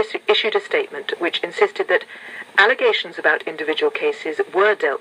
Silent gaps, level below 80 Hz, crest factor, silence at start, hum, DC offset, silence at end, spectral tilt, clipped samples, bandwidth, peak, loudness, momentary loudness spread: none; -78 dBFS; 18 dB; 0 s; none; under 0.1%; 0 s; -2.5 dB/octave; under 0.1%; 11 kHz; -2 dBFS; -19 LUFS; 8 LU